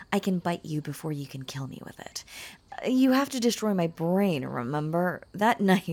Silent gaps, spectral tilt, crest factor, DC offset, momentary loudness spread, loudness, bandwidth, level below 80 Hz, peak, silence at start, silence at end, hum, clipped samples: none; -5.5 dB/octave; 20 dB; under 0.1%; 16 LU; -28 LUFS; 18 kHz; -64 dBFS; -8 dBFS; 0 s; 0 s; none; under 0.1%